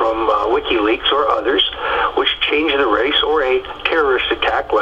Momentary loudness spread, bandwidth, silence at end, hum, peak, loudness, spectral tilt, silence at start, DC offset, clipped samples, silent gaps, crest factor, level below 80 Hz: 3 LU; 7.6 kHz; 0 s; none; -2 dBFS; -16 LUFS; -4.5 dB/octave; 0 s; under 0.1%; under 0.1%; none; 16 dB; -40 dBFS